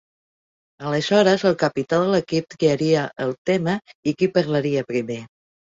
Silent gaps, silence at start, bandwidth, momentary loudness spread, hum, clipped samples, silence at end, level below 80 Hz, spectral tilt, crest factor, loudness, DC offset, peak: 3.38-3.45 s, 3.95-4.03 s; 0.8 s; 7.8 kHz; 9 LU; none; under 0.1%; 0.55 s; -60 dBFS; -6 dB/octave; 18 dB; -21 LUFS; under 0.1%; -4 dBFS